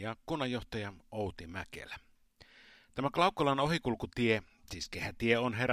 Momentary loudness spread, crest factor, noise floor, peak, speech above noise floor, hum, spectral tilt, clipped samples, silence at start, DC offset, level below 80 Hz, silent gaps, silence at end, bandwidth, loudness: 15 LU; 22 dB; -63 dBFS; -12 dBFS; 29 dB; none; -5.5 dB/octave; under 0.1%; 0 s; under 0.1%; -56 dBFS; none; 0 s; 15.5 kHz; -34 LUFS